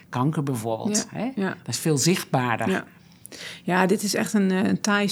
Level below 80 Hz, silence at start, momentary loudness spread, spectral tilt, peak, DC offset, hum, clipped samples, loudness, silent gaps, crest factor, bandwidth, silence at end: -70 dBFS; 0.1 s; 8 LU; -4.5 dB/octave; -4 dBFS; under 0.1%; none; under 0.1%; -24 LUFS; none; 20 dB; over 20 kHz; 0 s